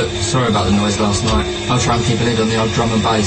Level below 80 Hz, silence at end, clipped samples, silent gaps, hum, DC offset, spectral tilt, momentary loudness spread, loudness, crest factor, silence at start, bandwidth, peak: -30 dBFS; 0 s; under 0.1%; none; none; under 0.1%; -4.5 dB/octave; 2 LU; -16 LUFS; 12 dB; 0 s; 8.8 kHz; -4 dBFS